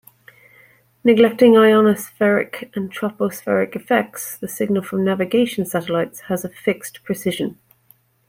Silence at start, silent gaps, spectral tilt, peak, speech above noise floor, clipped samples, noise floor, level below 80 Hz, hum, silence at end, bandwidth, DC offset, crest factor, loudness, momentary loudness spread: 1.05 s; none; -5.5 dB/octave; -2 dBFS; 38 dB; under 0.1%; -56 dBFS; -62 dBFS; none; 0.75 s; 16.5 kHz; under 0.1%; 18 dB; -19 LUFS; 15 LU